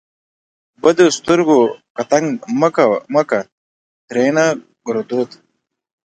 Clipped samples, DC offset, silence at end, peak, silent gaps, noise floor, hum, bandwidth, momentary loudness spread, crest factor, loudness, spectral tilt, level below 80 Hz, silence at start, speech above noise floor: under 0.1%; under 0.1%; 0.8 s; 0 dBFS; 1.90-1.95 s, 3.52-4.08 s; under -90 dBFS; none; 9.4 kHz; 11 LU; 16 dB; -16 LUFS; -5 dB/octave; -60 dBFS; 0.85 s; over 75 dB